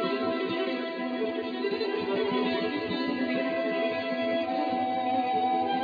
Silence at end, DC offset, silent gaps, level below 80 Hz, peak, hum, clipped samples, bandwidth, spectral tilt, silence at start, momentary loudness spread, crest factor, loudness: 0 s; under 0.1%; none; -72 dBFS; -16 dBFS; none; under 0.1%; 5 kHz; -7 dB/octave; 0 s; 4 LU; 12 dB; -29 LUFS